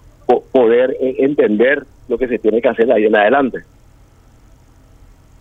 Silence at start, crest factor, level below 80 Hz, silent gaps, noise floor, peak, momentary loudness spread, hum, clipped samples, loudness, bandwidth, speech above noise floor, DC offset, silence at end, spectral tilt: 0.3 s; 16 dB; -46 dBFS; none; -46 dBFS; 0 dBFS; 9 LU; none; under 0.1%; -14 LUFS; 4 kHz; 33 dB; under 0.1%; 1.8 s; -7.5 dB/octave